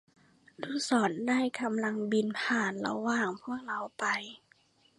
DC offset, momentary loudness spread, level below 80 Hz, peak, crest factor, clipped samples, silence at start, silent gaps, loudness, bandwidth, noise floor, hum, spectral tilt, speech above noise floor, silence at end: under 0.1%; 9 LU; -78 dBFS; -14 dBFS; 18 dB; under 0.1%; 0.6 s; none; -31 LUFS; 11.5 kHz; -66 dBFS; none; -4 dB/octave; 35 dB; 0.65 s